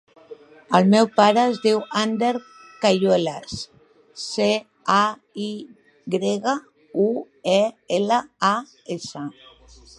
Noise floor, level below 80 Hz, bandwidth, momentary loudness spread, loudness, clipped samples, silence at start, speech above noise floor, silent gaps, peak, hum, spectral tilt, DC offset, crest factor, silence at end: -49 dBFS; -62 dBFS; 11.5 kHz; 16 LU; -21 LUFS; under 0.1%; 0.3 s; 28 dB; none; 0 dBFS; none; -5 dB/octave; under 0.1%; 22 dB; 0.7 s